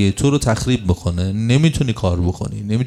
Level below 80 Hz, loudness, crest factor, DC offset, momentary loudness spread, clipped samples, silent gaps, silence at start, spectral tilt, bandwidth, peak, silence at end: -36 dBFS; -18 LUFS; 16 dB; under 0.1%; 6 LU; under 0.1%; none; 0 s; -6 dB/octave; 13.5 kHz; -2 dBFS; 0 s